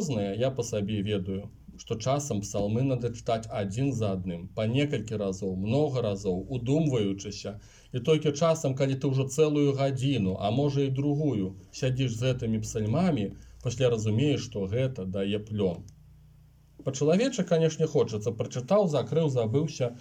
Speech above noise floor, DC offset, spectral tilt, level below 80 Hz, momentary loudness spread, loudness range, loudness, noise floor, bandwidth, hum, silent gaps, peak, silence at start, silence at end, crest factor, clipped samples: 29 dB; under 0.1%; -6.5 dB/octave; -54 dBFS; 9 LU; 4 LU; -28 LUFS; -56 dBFS; 15.5 kHz; none; none; -12 dBFS; 0 s; 0 s; 16 dB; under 0.1%